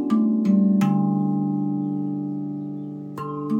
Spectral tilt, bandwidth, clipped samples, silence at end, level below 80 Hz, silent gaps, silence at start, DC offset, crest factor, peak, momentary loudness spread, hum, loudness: -9.5 dB/octave; 7.4 kHz; under 0.1%; 0 s; -68 dBFS; none; 0 s; under 0.1%; 14 dB; -8 dBFS; 13 LU; none; -23 LUFS